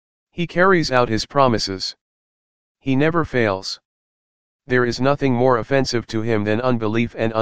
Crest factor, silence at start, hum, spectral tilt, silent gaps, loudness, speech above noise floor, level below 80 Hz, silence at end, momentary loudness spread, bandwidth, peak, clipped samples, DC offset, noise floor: 20 dB; 0.25 s; none; -5.5 dB/octave; 2.01-2.75 s, 3.85-4.59 s; -19 LUFS; over 71 dB; -46 dBFS; 0 s; 10 LU; 9.6 kHz; 0 dBFS; under 0.1%; 2%; under -90 dBFS